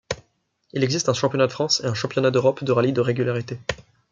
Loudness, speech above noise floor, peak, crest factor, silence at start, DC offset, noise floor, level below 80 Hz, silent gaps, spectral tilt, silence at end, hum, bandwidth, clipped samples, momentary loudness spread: -22 LUFS; 45 dB; -6 dBFS; 18 dB; 0.1 s; under 0.1%; -67 dBFS; -56 dBFS; none; -5 dB/octave; 0.3 s; none; 7.6 kHz; under 0.1%; 12 LU